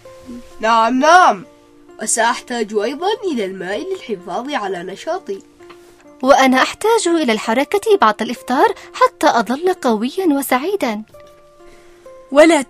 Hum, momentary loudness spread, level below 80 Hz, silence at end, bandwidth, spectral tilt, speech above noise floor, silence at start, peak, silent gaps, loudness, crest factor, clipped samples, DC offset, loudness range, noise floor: none; 14 LU; -52 dBFS; 0.05 s; 15.5 kHz; -3 dB/octave; 28 dB; 0.05 s; 0 dBFS; none; -16 LUFS; 16 dB; under 0.1%; under 0.1%; 7 LU; -43 dBFS